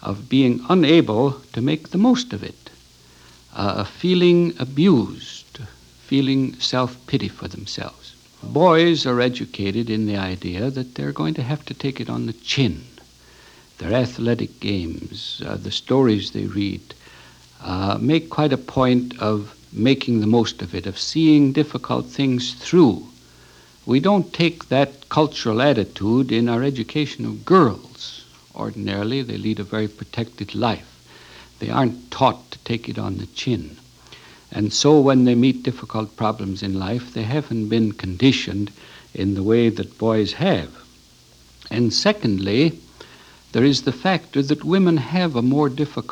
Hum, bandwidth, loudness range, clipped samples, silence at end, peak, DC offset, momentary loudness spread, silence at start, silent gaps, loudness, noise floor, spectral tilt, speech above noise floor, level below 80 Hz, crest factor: none; 11 kHz; 5 LU; under 0.1%; 0.05 s; -2 dBFS; under 0.1%; 14 LU; 0 s; none; -20 LUFS; -50 dBFS; -6 dB/octave; 31 dB; -52 dBFS; 20 dB